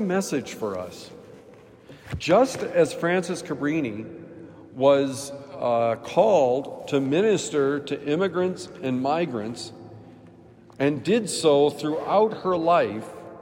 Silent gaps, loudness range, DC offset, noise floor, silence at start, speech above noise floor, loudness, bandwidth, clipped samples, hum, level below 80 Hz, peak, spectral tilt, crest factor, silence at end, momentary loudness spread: none; 4 LU; under 0.1%; -49 dBFS; 0 s; 26 dB; -24 LUFS; 16 kHz; under 0.1%; none; -60 dBFS; -6 dBFS; -5 dB/octave; 18 dB; 0 s; 17 LU